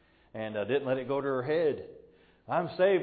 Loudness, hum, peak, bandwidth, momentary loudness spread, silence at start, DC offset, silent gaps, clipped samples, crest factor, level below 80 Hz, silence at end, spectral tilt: -31 LUFS; none; -14 dBFS; 4.8 kHz; 13 LU; 0.35 s; under 0.1%; none; under 0.1%; 16 dB; -68 dBFS; 0 s; -10 dB/octave